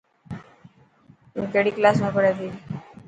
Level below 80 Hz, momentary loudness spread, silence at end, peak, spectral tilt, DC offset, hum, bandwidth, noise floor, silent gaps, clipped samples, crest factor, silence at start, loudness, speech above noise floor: -60 dBFS; 20 LU; 0.25 s; -2 dBFS; -7 dB/octave; under 0.1%; none; 9 kHz; -55 dBFS; none; under 0.1%; 22 dB; 0.3 s; -22 LUFS; 34 dB